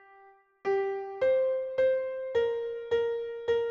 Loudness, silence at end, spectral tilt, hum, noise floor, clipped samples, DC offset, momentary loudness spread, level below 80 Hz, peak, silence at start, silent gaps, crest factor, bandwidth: -30 LUFS; 0 s; -5.5 dB/octave; none; -58 dBFS; under 0.1%; under 0.1%; 7 LU; -66 dBFS; -16 dBFS; 0.25 s; none; 12 dB; 6.8 kHz